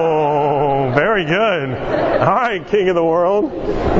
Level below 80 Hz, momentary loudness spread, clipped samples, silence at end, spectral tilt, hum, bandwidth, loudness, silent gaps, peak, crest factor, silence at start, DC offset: -34 dBFS; 5 LU; under 0.1%; 0 s; -7.5 dB/octave; none; 7.6 kHz; -16 LUFS; none; 0 dBFS; 16 dB; 0 s; under 0.1%